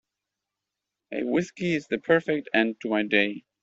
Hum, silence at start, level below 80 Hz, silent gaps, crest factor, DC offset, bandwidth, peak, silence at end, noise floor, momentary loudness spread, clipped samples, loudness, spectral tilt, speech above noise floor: none; 1.1 s; -68 dBFS; none; 22 dB; under 0.1%; 7.8 kHz; -6 dBFS; 0.25 s; -86 dBFS; 5 LU; under 0.1%; -25 LUFS; -5.5 dB/octave; 61 dB